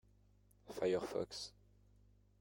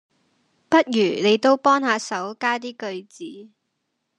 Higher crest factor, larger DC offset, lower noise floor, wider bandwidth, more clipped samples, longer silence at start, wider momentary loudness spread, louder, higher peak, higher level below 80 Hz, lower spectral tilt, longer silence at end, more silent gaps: about the same, 20 dB vs 20 dB; neither; second, -70 dBFS vs -76 dBFS; first, 16.5 kHz vs 10.5 kHz; neither; about the same, 0.65 s vs 0.7 s; second, 14 LU vs 18 LU; second, -42 LUFS vs -20 LUFS; second, -26 dBFS vs -2 dBFS; first, -70 dBFS vs -76 dBFS; about the same, -4.5 dB/octave vs -4 dB/octave; first, 0.9 s vs 0.75 s; neither